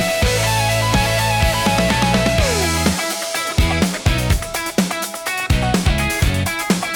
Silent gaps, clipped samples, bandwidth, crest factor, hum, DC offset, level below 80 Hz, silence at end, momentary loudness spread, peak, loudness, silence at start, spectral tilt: none; under 0.1%; 18 kHz; 14 dB; none; under 0.1%; -26 dBFS; 0 s; 5 LU; -2 dBFS; -17 LUFS; 0 s; -4 dB/octave